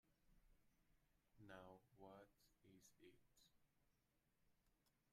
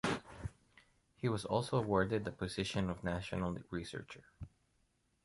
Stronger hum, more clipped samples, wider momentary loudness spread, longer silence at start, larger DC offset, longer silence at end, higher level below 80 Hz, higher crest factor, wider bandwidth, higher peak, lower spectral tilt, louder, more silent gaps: neither; neither; second, 4 LU vs 18 LU; about the same, 0.05 s vs 0.05 s; neither; second, 0 s vs 0.8 s; second, -84 dBFS vs -58 dBFS; about the same, 22 dB vs 22 dB; first, 14.5 kHz vs 11.5 kHz; second, -48 dBFS vs -18 dBFS; second, -4.5 dB/octave vs -6 dB/octave; second, -66 LUFS vs -38 LUFS; neither